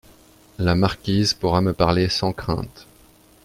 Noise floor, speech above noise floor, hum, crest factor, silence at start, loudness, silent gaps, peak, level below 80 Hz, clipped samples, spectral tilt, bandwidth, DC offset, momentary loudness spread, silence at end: -52 dBFS; 32 dB; none; 20 dB; 0.6 s; -21 LUFS; none; -2 dBFS; -42 dBFS; under 0.1%; -5.5 dB/octave; 16 kHz; under 0.1%; 8 LU; 0.6 s